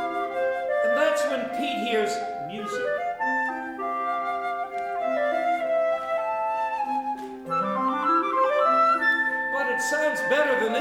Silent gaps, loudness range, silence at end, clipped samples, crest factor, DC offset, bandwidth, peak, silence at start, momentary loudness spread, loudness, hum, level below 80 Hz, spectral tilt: none; 5 LU; 0 s; under 0.1%; 14 dB; under 0.1%; 16.5 kHz; -12 dBFS; 0 s; 8 LU; -25 LUFS; none; -66 dBFS; -3.5 dB/octave